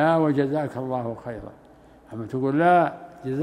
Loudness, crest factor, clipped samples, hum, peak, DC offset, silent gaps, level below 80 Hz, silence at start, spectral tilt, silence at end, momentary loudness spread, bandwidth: -23 LUFS; 18 dB; under 0.1%; none; -6 dBFS; under 0.1%; none; -58 dBFS; 0 s; -8.5 dB/octave; 0 s; 19 LU; 10.5 kHz